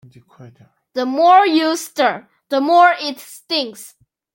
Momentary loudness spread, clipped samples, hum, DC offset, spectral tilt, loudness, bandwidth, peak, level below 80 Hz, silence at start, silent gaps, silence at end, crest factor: 17 LU; under 0.1%; none; under 0.1%; -3 dB/octave; -15 LUFS; 17 kHz; -2 dBFS; -72 dBFS; 0.4 s; none; 0.45 s; 16 dB